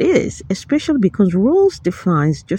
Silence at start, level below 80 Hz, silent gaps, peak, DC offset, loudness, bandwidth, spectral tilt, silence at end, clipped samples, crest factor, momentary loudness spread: 0 s; -44 dBFS; none; -2 dBFS; under 0.1%; -16 LUFS; 10.5 kHz; -7 dB/octave; 0 s; under 0.1%; 14 dB; 7 LU